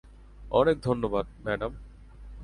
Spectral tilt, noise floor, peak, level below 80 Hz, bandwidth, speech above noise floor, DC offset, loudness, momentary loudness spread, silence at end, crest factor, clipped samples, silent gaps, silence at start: -7.5 dB/octave; -46 dBFS; -8 dBFS; -46 dBFS; 11 kHz; 19 dB; under 0.1%; -28 LUFS; 17 LU; 0 s; 22 dB; under 0.1%; none; 0.05 s